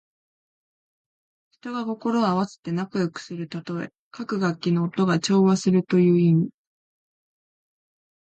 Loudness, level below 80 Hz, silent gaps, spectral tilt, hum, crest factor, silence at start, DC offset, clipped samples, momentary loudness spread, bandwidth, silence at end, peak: -23 LUFS; -68 dBFS; 2.58-2.63 s, 3.98-4.11 s; -7 dB/octave; none; 16 dB; 1.65 s; under 0.1%; under 0.1%; 14 LU; 8.8 kHz; 1.8 s; -10 dBFS